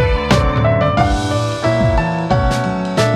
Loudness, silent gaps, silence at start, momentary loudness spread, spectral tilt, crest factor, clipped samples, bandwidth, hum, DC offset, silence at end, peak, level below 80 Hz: -15 LUFS; none; 0 s; 3 LU; -6 dB/octave; 14 dB; under 0.1%; 13 kHz; none; under 0.1%; 0 s; 0 dBFS; -24 dBFS